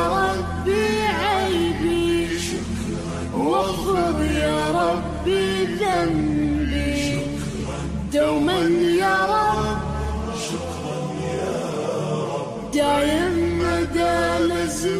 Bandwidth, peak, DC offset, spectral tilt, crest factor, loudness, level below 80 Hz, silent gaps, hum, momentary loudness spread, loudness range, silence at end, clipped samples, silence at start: 15.5 kHz; -10 dBFS; under 0.1%; -5 dB/octave; 12 dB; -22 LUFS; -36 dBFS; none; none; 8 LU; 3 LU; 0 s; under 0.1%; 0 s